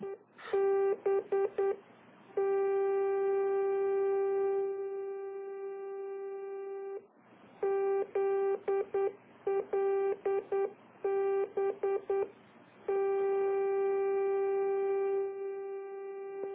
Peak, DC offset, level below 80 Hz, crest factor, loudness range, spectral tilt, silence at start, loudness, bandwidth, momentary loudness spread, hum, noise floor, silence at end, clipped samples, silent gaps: -22 dBFS; under 0.1%; -80 dBFS; 12 dB; 4 LU; -4.5 dB/octave; 0 s; -33 LUFS; 3.8 kHz; 11 LU; none; -59 dBFS; 0 s; under 0.1%; none